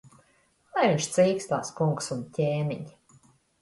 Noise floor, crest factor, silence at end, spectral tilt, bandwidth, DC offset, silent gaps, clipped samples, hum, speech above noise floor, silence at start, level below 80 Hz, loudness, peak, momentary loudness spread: -66 dBFS; 18 dB; 0.7 s; -5.5 dB/octave; 11.5 kHz; under 0.1%; none; under 0.1%; none; 39 dB; 0.75 s; -66 dBFS; -27 LUFS; -10 dBFS; 10 LU